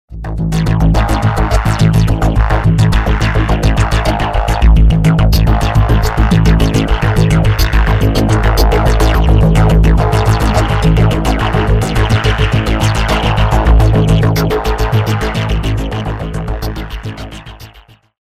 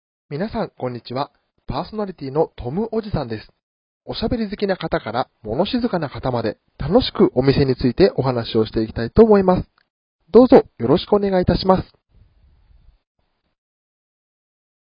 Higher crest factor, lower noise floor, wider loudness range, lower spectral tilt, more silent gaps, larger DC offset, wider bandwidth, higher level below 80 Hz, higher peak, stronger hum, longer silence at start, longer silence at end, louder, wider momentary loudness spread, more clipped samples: second, 10 dB vs 20 dB; second, -42 dBFS vs -54 dBFS; second, 3 LU vs 10 LU; second, -6.5 dB/octave vs -10 dB/octave; second, none vs 3.63-4.01 s, 9.90-10.19 s; neither; first, 15 kHz vs 5.4 kHz; first, -14 dBFS vs -38 dBFS; about the same, 0 dBFS vs 0 dBFS; neither; second, 0.1 s vs 0.3 s; second, 0.4 s vs 3.15 s; first, -12 LUFS vs -19 LUFS; second, 9 LU vs 14 LU; neither